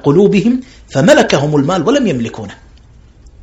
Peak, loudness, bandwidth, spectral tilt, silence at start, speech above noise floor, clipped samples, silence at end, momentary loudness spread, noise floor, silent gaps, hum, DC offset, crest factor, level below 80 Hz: 0 dBFS; -12 LUFS; 12.5 kHz; -6 dB/octave; 0.05 s; 30 dB; 0.5%; 0.9 s; 13 LU; -41 dBFS; none; none; under 0.1%; 12 dB; -42 dBFS